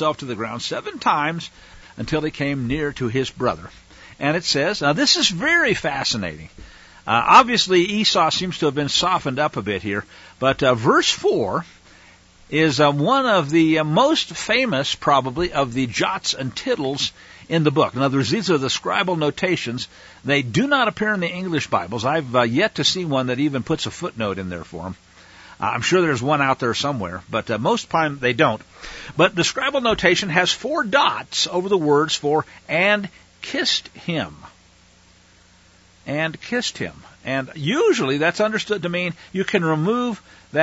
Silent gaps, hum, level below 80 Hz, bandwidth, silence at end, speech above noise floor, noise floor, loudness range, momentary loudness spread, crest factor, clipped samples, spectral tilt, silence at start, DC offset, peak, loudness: none; none; -50 dBFS; 8 kHz; 0 s; 32 dB; -52 dBFS; 6 LU; 11 LU; 20 dB; under 0.1%; -4 dB/octave; 0 s; under 0.1%; 0 dBFS; -20 LUFS